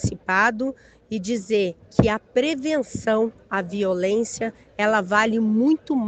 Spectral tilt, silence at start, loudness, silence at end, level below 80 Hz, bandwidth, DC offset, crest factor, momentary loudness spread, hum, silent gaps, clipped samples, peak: -5.5 dB/octave; 0 s; -22 LUFS; 0 s; -46 dBFS; 9 kHz; under 0.1%; 22 dB; 9 LU; none; none; under 0.1%; 0 dBFS